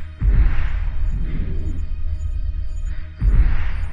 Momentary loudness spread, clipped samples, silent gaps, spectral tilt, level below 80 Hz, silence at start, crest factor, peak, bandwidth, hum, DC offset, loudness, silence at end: 10 LU; under 0.1%; none; -8 dB/octave; -20 dBFS; 0 s; 14 dB; -4 dBFS; 4.7 kHz; none; under 0.1%; -24 LUFS; 0 s